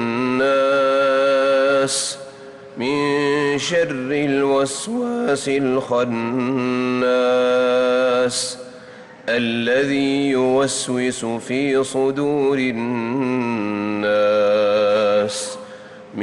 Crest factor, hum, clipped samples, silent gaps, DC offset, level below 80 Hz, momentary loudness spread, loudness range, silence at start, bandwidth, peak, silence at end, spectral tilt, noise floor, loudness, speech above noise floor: 10 dB; none; under 0.1%; none; under 0.1%; -62 dBFS; 9 LU; 2 LU; 0 s; 12 kHz; -8 dBFS; 0 s; -4 dB/octave; -40 dBFS; -19 LUFS; 21 dB